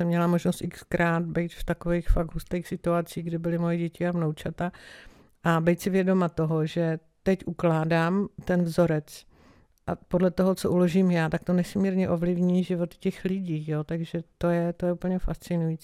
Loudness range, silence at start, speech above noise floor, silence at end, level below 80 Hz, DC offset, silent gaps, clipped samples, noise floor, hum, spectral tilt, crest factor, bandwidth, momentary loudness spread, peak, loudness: 4 LU; 0 s; 32 dB; 0.05 s; -40 dBFS; under 0.1%; none; under 0.1%; -58 dBFS; none; -7.5 dB/octave; 16 dB; 14.5 kHz; 8 LU; -10 dBFS; -27 LUFS